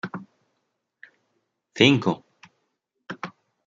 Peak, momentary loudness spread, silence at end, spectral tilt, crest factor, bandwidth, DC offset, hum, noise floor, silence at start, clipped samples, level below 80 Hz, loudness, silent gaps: -2 dBFS; 23 LU; 0.4 s; -5.5 dB/octave; 26 dB; 7.6 kHz; under 0.1%; none; -77 dBFS; 0.05 s; under 0.1%; -68 dBFS; -20 LUFS; none